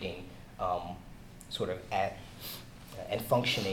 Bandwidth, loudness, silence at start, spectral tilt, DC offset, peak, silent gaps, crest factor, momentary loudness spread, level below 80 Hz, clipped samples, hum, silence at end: 19 kHz; -35 LUFS; 0 s; -4.5 dB/octave; under 0.1%; -14 dBFS; none; 20 dB; 19 LU; -54 dBFS; under 0.1%; none; 0 s